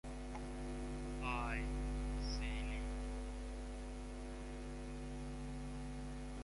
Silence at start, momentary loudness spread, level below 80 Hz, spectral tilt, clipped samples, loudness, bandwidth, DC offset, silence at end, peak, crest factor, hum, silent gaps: 0.05 s; 7 LU; -46 dBFS; -5.5 dB/octave; under 0.1%; -46 LUFS; 11.5 kHz; under 0.1%; 0 s; -28 dBFS; 16 dB; none; none